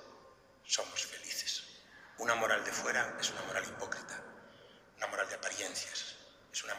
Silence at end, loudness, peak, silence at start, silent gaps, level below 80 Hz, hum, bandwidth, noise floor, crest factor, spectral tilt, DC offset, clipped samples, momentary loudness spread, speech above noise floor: 0 s; -37 LUFS; -16 dBFS; 0 s; none; -76 dBFS; none; 16 kHz; -61 dBFS; 22 dB; -0.5 dB/octave; under 0.1%; under 0.1%; 21 LU; 23 dB